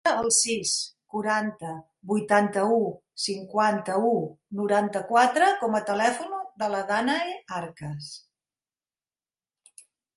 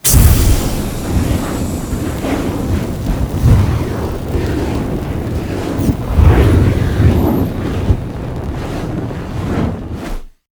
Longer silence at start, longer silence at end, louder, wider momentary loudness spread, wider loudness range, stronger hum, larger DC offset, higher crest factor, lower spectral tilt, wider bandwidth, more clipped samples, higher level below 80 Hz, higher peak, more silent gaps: about the same, 0.05 s vs 0.05 s; first, 2 s vs 0.2 s; second, -25 LUFS vs -16 LUFS; first, 15 LU vs 11 LU; first, 7 LU vs 3 LU; neither; neither; first, 20 dB vs 14 dB; second, -3 dB/octave vs -6 dB/octave; second, 12 kHz vs over 20 kHz; second, under 0.1% vs 0.2%; second, -70 dBFS vs -18 dBFS; second, -6 dBFS vs 0 dBFS; neither